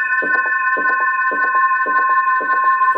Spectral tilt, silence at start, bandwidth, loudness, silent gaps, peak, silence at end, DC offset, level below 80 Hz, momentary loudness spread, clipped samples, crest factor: -4.5 dB/octave; 0 s; 5.4 kHz; -15 LUFS; none; -6 dBFS; 0 s; under 0.1%; under -90 dBFS; 1 LU; under 0.1%; 10 dB